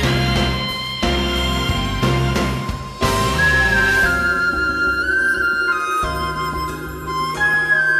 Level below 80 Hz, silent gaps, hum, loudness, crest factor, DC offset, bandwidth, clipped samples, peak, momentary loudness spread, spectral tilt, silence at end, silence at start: -30 dBFS; none; none; -18 LUFS; 14 dB; under 0.1%; 15 kHz; under 0.1%; -4 dBFS; 9 LU; -4.5 dB/octave; 0 s; 0 s